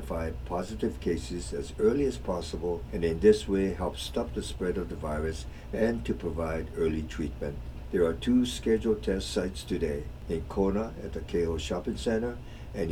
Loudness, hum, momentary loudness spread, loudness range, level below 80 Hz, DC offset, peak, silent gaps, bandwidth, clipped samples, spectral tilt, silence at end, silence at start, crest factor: -30 LUFS; none; 9 LU; 4 LU; -40 dBFS; under 0.1%; -10 dBFS; none; 15.5 kHz; under 0.1%; -6 dB/octave; 0 s; 0 s; 20 dB